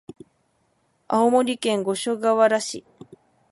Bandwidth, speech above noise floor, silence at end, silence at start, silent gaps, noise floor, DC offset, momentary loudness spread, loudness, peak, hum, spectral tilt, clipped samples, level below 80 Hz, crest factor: 11.5 kHz; 47 dB; 0.7 s; 1.1 s; none; -67 dBFS; under 0.1%; 8 LU; -21 LUFS; -4 dBFS; none; -4 dB/octave; under 0.1%; -72 dBFS; 18 dB